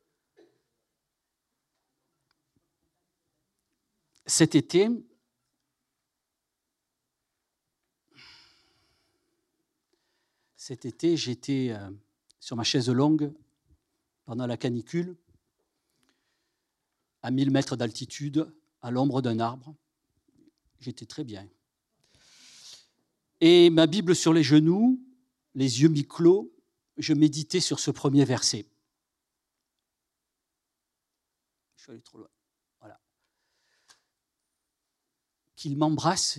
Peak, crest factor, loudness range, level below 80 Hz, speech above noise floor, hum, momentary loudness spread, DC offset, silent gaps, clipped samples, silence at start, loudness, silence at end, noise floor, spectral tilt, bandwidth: -6 dBFS; 22 dB; 14 LU; -74 dBFS; 61 dB; none; 21 LU; under 0.1%; none; under 0.1%; 4.25 s; -25 LUFS; 0 s; -85 dBFS; -5 dB/octave; 12.5 kHz